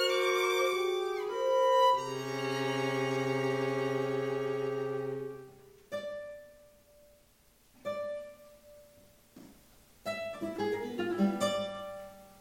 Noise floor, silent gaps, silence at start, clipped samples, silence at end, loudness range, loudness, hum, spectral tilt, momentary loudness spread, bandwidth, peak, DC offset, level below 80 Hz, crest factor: -65 dBFS; none; 0 s; under 0.1%; 0.05 s; 15 LU; -32 LUFS; none; -4.5 dB/octave; 16 LU; 16.5 kHz; -16 dBFS; under 0.1%; -70 dBFS; 18 dB